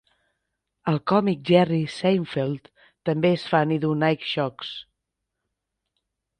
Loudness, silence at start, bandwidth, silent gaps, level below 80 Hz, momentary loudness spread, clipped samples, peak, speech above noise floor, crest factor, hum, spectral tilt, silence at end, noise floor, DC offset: -23 LUFS; 0.85 s; 9.6 kHz; none; -64 dBFS; 12 LU; under 0.1%; -4 dBFS; 59 dB; 20 dB; none; -7.5 dB/octave; 1.55 s; -82 dBFS; under 0.1%